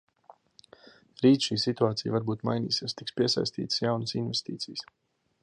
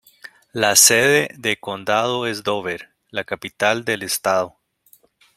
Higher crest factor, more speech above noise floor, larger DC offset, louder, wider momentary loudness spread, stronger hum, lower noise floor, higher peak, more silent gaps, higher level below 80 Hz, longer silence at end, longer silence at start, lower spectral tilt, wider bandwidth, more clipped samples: about the same, 20 dB vs 20 dB; second, 30 dB vs 36 dB; neither; second, -28 LUFS vs -18 LUFS; second, 11 LU vs 18 LU; neither; about the same, -58 dBFS vs -56 dBFS; second, -10 dBFS vs 0 dBFS; neither; second, -68 dBFS vs -62 dBFS; second, 0.6 s vs 0.9 s; first, 1.2 s vs 0.55 s; first, -5.5 dB/octave vs -1.5 dB/octave; second, 11 kHz vs 16.5 kHz; neither